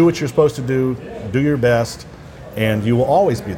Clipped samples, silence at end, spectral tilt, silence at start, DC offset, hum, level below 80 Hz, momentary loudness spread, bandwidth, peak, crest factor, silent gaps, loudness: under 0.1%; 0 s; -7 dB/octave; 0 s; under 0.1%; none; -44 dBFS; 16 LU; 16.5 kHz; -2 dBFS; 16 dB; none; -17 LUFS